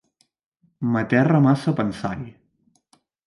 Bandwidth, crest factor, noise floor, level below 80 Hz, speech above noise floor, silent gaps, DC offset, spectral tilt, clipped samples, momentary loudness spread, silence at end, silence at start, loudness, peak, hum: 11.5 kHz; 20 dB; -65 dBFS; -56 dBFS; 45 dB; none; under 0.1%; -8.5 dB/octave; under 0.1%; 14 LU; 0.95 s; 0.8 s; -21 LUFS; -4 dBFS; none